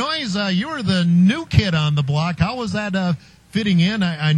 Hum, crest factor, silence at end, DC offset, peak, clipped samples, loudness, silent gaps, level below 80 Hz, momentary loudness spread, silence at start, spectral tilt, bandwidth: none; 18 dB; 0 s; under 0.1%; 0 dBFS; under 0.1%; -19 LUFS; none; -40 dBFS; 7 LU; 0 s; -6.5 dB/octave; 9.8 kHz